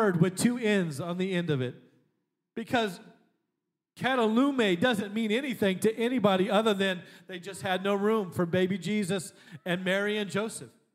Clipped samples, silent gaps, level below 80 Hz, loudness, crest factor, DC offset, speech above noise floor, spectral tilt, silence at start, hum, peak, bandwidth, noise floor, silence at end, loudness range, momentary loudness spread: under 0.1%; none; -76 dBFS; -28 LUFS; 20 dB; under 0.1%; 57 dB; -5.5 dB/octave; 0 s; none; -8 dBFS; 16 kHz; -85 dBFS; 0.25 s; 5 LU; 12 LU